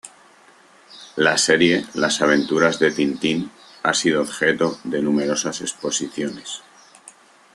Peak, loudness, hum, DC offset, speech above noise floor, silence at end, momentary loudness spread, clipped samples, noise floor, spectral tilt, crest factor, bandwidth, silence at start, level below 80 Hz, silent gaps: -2 dBFS; -20 LUFS; none; under 0.1%; 31 dB; 0.45 s; 12 LU; under 0.1%; -51 dBFS; -3 dB/octave; 20 dB; 12.5 kHz; 0.05 s; -62 dBFS; none